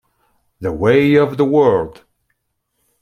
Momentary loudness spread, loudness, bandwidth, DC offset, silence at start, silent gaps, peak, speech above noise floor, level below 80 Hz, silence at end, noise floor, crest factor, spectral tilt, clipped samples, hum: 14 LU; -14 LUFS; 13.5 kHz; under 0.1%; 0.6 s; none; -2 dBFS; 57 dB; -48 dBFS; 1.1 s; -70 dBFS; 16 dB; -8 dB/octave; under 0.1%; none